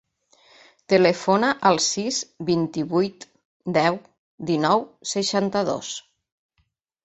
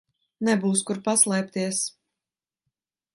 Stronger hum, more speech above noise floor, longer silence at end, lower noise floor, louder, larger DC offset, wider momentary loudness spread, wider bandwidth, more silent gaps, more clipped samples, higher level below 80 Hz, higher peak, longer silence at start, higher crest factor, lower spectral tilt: neither; second, 49 dB vs over 66 dB; second, 1.05 s vs 1.25 s; second, -71 dBFS vs under -90 dBFS; about the same, -22 LUFS vs -23 LUFS; neither; first, 11 LU vs 8 LU; second, 8.2 kHz vs 12 kHz; first, 3.45-3.60 s, 4.19-4.38 s vs none; neither; first, -64 dBFS vs -74 dBFS; first, -2 dBFS vs -6 dBFS; first, 0.9 s vs 0.4 s; about the same, 22 dB vs 22 dB; about the same, -4 dB/octave vs -3.5 dB/octave